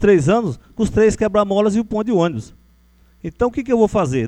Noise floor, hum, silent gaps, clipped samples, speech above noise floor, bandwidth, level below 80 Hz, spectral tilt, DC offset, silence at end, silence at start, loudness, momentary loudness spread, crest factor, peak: -52 dBFS; none; none; under 0.1%; 36 dB; 10.5 kHz; -38 dBFS; -7 dB/octave; under 0.1%; 0 s; 0 s; -17 LUFS; 10 LU; 16 dB; -2 dBFS